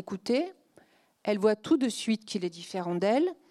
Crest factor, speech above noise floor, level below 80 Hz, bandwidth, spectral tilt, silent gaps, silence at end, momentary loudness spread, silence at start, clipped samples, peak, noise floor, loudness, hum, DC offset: 18 dB; 34 dB; -78 dBFS; 13 kHz; -5 dB/octave; none; 0.15 s; 9 LU; 0 s; under 0.1%; -12 dBFS; -62 dBFS; -29 LUFS; none; under 0.1%